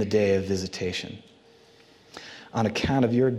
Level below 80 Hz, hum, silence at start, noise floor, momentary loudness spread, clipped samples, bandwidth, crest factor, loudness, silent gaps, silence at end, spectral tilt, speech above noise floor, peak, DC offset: -56 dBFS; none; 0 s; -55 dBFS; 21 LU; under 0.1%; 13 kHz; 16 dB; -26 LUFS; none; 0 s; -6 dB/octave; 31 dB; -10 dBFS; under 0.1%